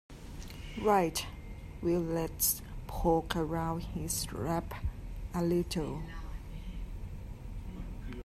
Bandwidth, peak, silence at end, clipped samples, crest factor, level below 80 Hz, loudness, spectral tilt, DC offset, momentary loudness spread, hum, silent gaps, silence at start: 15.5 kHz; -14 dBFS; 0 s; under 0.1%; 20 dB; -44 dBFS; -34 LUFS; -5 dB/octave; under 0.1%; 16 LU; none; none; 0.1 s